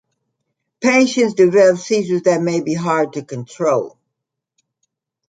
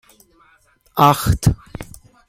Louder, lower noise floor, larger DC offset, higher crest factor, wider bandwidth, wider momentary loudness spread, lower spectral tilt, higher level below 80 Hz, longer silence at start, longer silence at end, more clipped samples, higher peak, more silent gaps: about the same, -16 LUFS vs -16 LUFS; first, -80 dBFS vs -56 dBFS; neither; about the same, 16 dB vs 20 dB; second, 9.4 kHz vs 16.5 kHz; second, 10 LU vs 22 LU; about the same, -5 dB/octave vs -5.5 dB/octave; second, -66 dBFS vs -34 dBFS; second, 0.8 s vs 0.95 s; first, 1.4 s vs 0.45 s; neither; about the same, -2 dBFS vs 0 dBFS; neither